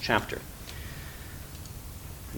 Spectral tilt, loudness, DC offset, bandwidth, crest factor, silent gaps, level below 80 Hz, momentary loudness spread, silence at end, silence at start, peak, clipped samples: -4 dB/octave; -37 LUFS; under 0.1%; 19 kHz; 28 dB; none; -46 dBFS; 14 LU; 0 s; 0 s; -6 dBFS; under 0.1%